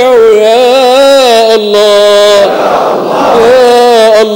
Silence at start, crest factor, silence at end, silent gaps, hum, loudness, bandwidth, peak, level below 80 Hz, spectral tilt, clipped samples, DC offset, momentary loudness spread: 0 s; 4 dB; 0 s; none; none; -4 LUFS; 18.5 kHz; 0 dBFS; -44 dBFS; -3 dB/octave; 10%; under 0.1%; 5 LU